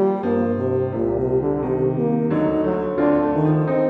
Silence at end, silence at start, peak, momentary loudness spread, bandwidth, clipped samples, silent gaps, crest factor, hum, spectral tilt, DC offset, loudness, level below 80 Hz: 0 s; 0 s; -6 dBFS; 3 LU; 4.5 kHz; under 0.1%; none; 14 dB; none; -11 dB/octave; under 0.1%; -20 LUFS; -44 dBFS